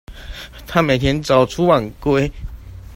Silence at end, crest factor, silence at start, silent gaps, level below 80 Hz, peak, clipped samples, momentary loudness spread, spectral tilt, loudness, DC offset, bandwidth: 0 s; 18 dB; 0.1 s; none; -34 dBFS; 0 dBFS; under 0.1%; 20 LU; -6 dB/octave; -17 LUFS; under 0.1%; 16.5 kHz